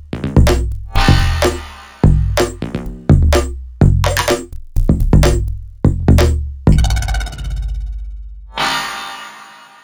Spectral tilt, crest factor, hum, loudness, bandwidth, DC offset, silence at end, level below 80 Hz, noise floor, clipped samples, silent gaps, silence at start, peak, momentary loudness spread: -6 dB/octave; 14 dB; none; -15 LUFS; 20 kHz; under 0.1%; 0.35 s; -18 dBFS; -38 dBFS; under 0.1%; none; 0 s; 0 dBFS; 15 LU